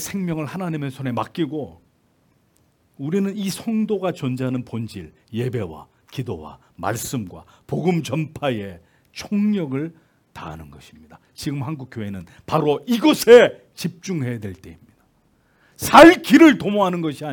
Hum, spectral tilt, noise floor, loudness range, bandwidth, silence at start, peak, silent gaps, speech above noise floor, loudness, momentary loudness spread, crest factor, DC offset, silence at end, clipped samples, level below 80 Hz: none; -5.5 dB/octave; -61 dBFS; 12 LU; 18 kHz; 0 s; 0 dBFS; none; 42 dB; -19 LUFS; 23 LU; 20 dB; under 0.1%; 0 s; under 0.1%; -54 dBFS